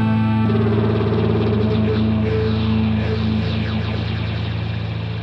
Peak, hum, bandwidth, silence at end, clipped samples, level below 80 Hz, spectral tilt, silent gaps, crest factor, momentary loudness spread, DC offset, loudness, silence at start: -6 dBFS; none; 5.8 kHz; 0 s; under 0.1%; -34 dBFS; -9 dB/octave; none; 12 dB; 6 LU; under 0.1%; -19 LUFS; 0 s